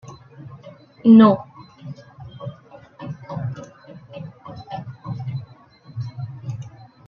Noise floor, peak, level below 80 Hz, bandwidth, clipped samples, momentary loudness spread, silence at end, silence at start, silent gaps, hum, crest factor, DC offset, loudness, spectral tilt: -47 dBFS; -2 dBFS; -60 dBFS; 6.4 kHz; under 0.1%; 29 LU; 0.4 s; 0.05 s; none; none; 20 dB; under 0.1%; -19 LUFS; -9 dB/octave